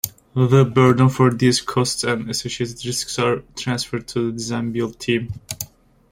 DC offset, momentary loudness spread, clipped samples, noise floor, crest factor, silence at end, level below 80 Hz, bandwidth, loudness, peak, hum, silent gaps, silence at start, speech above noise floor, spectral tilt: under 0.1%; 11 LU; under 0.1%; -41 dBFS; 18 dB; 0.45 s; -50 dBFS; 16.5 kHz; -20 LUFS; -2 dBFS; none; none; 0.05 s; 22 dB; -5 dB/octave